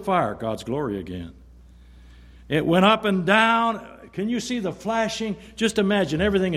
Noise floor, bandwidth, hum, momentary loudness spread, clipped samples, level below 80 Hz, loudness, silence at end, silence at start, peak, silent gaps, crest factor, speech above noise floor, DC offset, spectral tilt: -48 dBFS; 13.5 kHz; none; 14 LU; under 0.1%; -48 dBFS; -22 LUFS; 0 s; 0 s; -2 dBFS; none; 20 dB; 25 dB; under 0.1%; -5 dB/octave